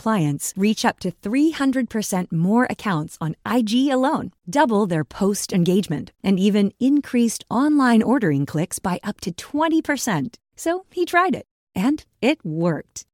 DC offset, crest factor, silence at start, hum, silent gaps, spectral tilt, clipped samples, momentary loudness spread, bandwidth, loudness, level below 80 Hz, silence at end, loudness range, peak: under 0.1%; 16 dB; 0.05 s; none; 11.51-11.67 s; -5.5 dB/octave; under 0.1%; 9 LU; 17.5 kHz; -21 LUFS; -56 dBFS; 0.15 s; 3 LU; -4 dBFS